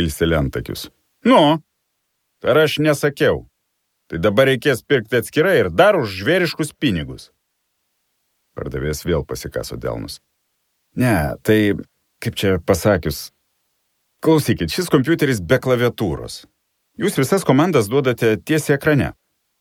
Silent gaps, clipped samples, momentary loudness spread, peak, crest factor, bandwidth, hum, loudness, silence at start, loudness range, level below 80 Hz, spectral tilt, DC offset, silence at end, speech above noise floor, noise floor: none; under 0.1%; 14 LU; 0 dBFS; 18 dB; 18.5 kHz; none; -18 LUFS; 0 s; 8 LU; -40 dBFS; -5.5 dB/octave; under 0.1%; 0.5 s; 55 dB; -72 dBFS